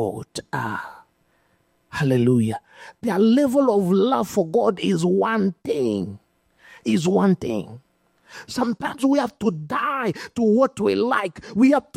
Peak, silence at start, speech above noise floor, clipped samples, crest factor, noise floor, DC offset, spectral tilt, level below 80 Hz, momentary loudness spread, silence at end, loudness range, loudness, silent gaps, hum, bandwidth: -6 dBFS; 0 s; 44 dB; under 0.1%; 16 dB; -65 dBFS; under 0.1%; -6.5 dB/octave; -60 dBFS; 12 LU; 0.15 s; 5 LU; -21 LUFS; none; none; 15.5 kHz